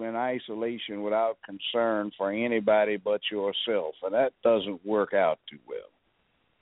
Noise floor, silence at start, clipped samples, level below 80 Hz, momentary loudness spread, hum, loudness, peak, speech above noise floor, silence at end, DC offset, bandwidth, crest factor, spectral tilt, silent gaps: -71 dBFS; 0 s; under 0.1%; -72 dBFS; 10 LU; none; -28 LUFS; -12 dBFS; 43 dB; 0.75 s; under 0.1%; 4 kHz; 16 dB; -2 dB/octave; none